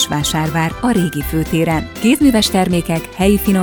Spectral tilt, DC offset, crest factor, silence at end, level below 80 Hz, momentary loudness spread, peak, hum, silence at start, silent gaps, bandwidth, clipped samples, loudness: -5 dB/octave; under 0.1%; 14 dB; 0 s; -32 dBFS; 6 LU; 0 dBFS; none; 0 s; none; over 20 kHz; under 0.1%; -15 LUFS